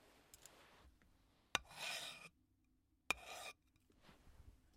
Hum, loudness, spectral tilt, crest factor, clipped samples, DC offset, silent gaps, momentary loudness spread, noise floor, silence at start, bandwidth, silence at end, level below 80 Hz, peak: none; -47 LUFS; -0.5 dB/octave; 38 dB; under 0.1%; under 0.1%; none; 24 LU; -79 dBFS; 0 s; 16 kHz; 0 s; -72 dBFS; -14 dBFS